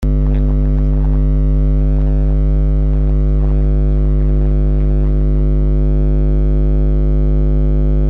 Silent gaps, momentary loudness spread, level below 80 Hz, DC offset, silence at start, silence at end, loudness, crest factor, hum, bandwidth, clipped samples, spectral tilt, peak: none; 0 LU; -12 dBFS; under 0.1%; 0 s; 0 s; -15 LUFS; 6 dB; 50 Hz at -10 dBFS; 2.4 kHz; under 0.1%; -11.5 dB/octave; -6 dBFS